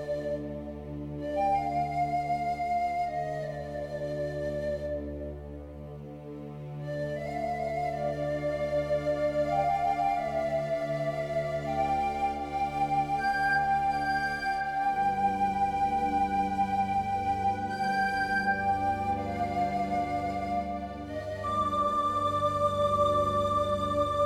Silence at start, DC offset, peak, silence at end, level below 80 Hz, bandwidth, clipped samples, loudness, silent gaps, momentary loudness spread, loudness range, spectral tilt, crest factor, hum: 0 s; under 0.1%; -14 dBFS; 0 s; -50 dBFS; 14.5 kHz; under 0.1%; -30 LUFS; none; 10 LU; 7 LU; -6 dB/octave; 14 dB; none